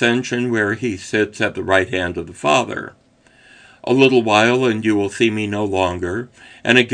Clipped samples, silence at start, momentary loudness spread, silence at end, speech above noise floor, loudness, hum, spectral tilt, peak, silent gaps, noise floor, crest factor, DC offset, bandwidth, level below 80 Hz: under 0.1%; 0 s; 13 LU; 0 s; 34 dB; -18 LUFS; none; -5 dB/octave; 0 dBFS; none; -51 dBFS; 18 dB; under 0.1%; 10 kHz; -54 dBFS